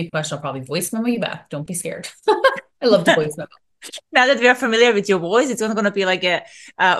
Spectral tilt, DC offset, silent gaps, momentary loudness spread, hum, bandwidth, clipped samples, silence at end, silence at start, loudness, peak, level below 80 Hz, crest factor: -3.5 dB/octave; under 0.1%; none; 14 LU; none; 12.5 kHz; under 0.1%; 0 s; 0 s; -18 LUFS; -2 dBFS; -64 dBFS; 16 dB